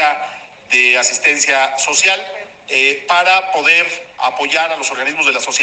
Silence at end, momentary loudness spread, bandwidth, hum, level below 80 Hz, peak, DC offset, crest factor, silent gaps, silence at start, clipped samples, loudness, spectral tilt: 0 s; 9 LU; 9.6 kHz; none; -66 dBFS; 0 dBFS; under 0.1%; 14 dB; none; 0 s; under 0.1%; -11 LUFS; 1 dB/octave